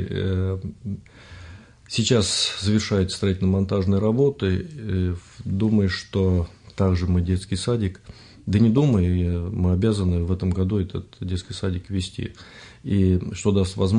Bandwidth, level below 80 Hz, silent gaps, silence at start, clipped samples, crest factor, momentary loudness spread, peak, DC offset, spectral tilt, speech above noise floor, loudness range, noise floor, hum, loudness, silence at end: 10.5 kHz; -46 dBFS; none; 0 s; under 0.1%; 16 dB; 14 LU; -6 dBFS; under 0.1%; -6 dB/octave; 21 dB; 4 LU; -43 dBFS; none; -23 LUFS; 0 s